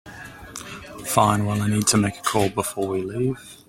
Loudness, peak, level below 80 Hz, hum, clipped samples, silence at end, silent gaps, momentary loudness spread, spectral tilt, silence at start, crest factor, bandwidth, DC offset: -22 LUFS; -2 dBFS; -52 dBFS; none; under 0.1%; 0.15 s; none; 18 LU; -4.5 dB/octave; 0.05 s; 22 dB; 16.5 kHz; under 0.1%